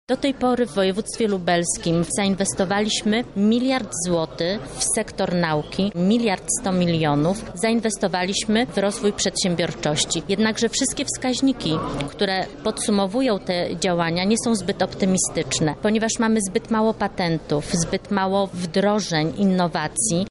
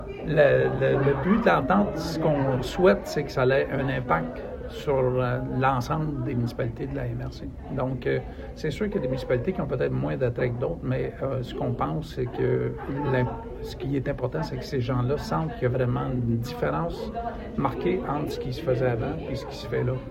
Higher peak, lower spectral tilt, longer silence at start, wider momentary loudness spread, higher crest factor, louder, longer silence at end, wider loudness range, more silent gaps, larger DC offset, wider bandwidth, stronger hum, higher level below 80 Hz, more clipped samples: about the same, -8 dBFS vs -6 dBFS; second, -4 dB/octave vs -7.5 dB/octave; about the same, 0.1 s vs 0 s; second, 4 LU vs 11 LU; second, 14 dB vs 20 dB; first, -22 LUFS vs -26 LUFS; about the same, 0 s vs 0 s; second, 1 LU vs 5 LU; neither; neither; second, 11.5 kHz vs 14 kHz; neither; about the same, -46 dBFS vs -42 dBFS; neither